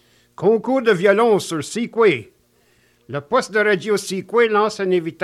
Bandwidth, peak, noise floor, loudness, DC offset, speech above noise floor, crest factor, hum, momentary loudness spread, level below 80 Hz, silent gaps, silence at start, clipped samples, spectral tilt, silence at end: 13.5 kHz; -2 dBFS; -59 dBFS; -18 LUFS; under 0.1%; 41 dB; 16 dB; 60 Hz at -50 dBFS; 9 LU; -66 dBFS; none; 0.4 s; under 0.1%; -5 dB/octave; 0 s